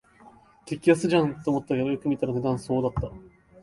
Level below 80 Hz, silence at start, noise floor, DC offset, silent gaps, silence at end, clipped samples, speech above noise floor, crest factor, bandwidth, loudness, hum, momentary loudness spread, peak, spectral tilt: -48 dBFS; 0.25 s; -53 dBFS; under 0.1%; none; 0.35 s; under 0.1%; 28 dB; 18 dB; 11.5 kHz; -25 LUFS; none; 9 LU; -8 dBFS; -7 dB/octave